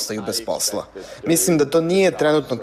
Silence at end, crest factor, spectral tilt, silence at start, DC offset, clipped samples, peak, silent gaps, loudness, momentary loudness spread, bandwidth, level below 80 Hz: 0 s; 14 dB; -4 dB/octave; 0 s; under 0.1%; under 0.1%; -6 dBFS; none; -19 LUFS; 12 LU; 16 kHz; -54 dBFS